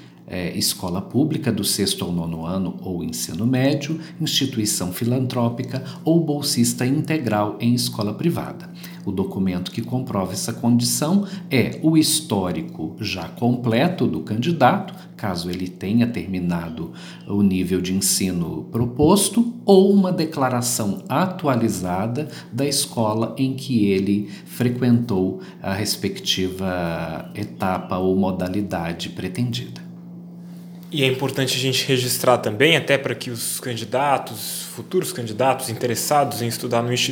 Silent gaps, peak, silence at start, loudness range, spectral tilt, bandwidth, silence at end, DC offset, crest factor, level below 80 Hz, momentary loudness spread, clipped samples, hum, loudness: none; 0 dBFS; 0 s; 5 LU; -4.5 dB/octave; over 20 kHz; 0 s; under 0.1%; 20 dB; -54 dBFS; 11 LU; under 0.1%; none; -21 LUFS